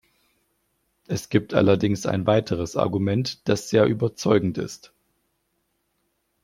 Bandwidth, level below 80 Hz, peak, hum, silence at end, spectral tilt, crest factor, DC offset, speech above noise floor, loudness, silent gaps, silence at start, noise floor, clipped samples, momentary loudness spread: 16 kHz; -56 dBFS; -4 dBFS; none; 1.7 s; -6 dB/octave; 20 dB; under 0.1%; 51 dB; -23 LUFS; none; 1.1 s; -73 dBFS; under 0.1%; 11 LU